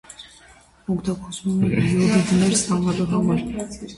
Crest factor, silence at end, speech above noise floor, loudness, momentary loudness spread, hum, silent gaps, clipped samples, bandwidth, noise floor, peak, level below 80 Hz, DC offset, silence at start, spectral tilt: 16 dB; 0 s; 30 dB; -21 LUFS; 13 LU; none; none; under 0.1%; 11.5 kHz; -50 dBFS; -6 dBFS; -46 dBFS; under 0.1%; 0.1 s; -5.5 dB/octave